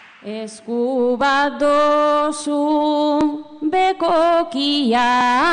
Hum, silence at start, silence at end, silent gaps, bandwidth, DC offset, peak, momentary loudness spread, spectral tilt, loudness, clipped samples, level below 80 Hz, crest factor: none; 0.25 s; 0 s; none; 10 kHz; under 0.1%; -6 dBFS; 10 LU; -3.5 dB/octave; -17 LUFS; under 0.1%; -54 dBFS; 10 dB